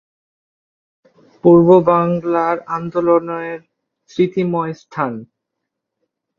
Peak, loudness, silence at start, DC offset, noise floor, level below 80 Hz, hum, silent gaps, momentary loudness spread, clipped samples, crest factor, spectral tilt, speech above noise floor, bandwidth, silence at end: 0 dBFS; -16 LUFS; 1.45 s; under 0.1%; -78 dBFS; -56 dBFS; none; none; 16 LU; under 0.1%; 18 dB; -9 dB/octave; 63 dB; 6.8 kHz; 1.15 s